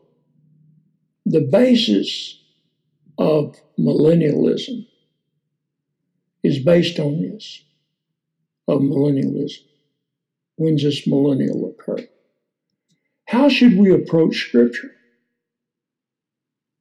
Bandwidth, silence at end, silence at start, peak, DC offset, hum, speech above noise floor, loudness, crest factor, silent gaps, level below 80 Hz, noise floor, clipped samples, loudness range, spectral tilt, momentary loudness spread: 11 kHz; 1.9 s; 1.25 s; -4 dBFS; under 0.1%; none; 69 dB; -17 LUFS; 16 dB; none; -64 dBFS; -85 dBFS; under 0.1%; 5 LU; -7 dB/octave; 15 LU